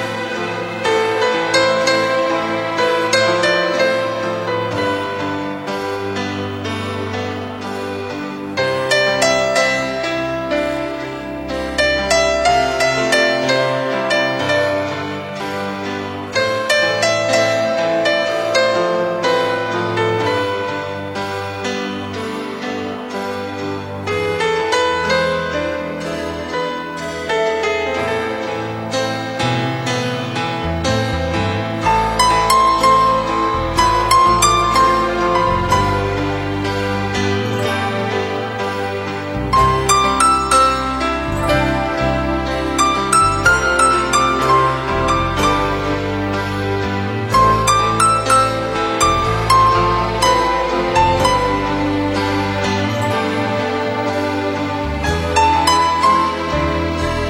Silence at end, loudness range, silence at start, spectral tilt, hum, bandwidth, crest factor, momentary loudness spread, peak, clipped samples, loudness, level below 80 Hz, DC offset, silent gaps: 0 s; 6 LU; 0 s; -4 dB/octave; none; 16.5 kHz; 16 dB; 10 LU; 0 dBFS; under 0.1%; -17 LUFS; -34 dBFS; under 0.1%; none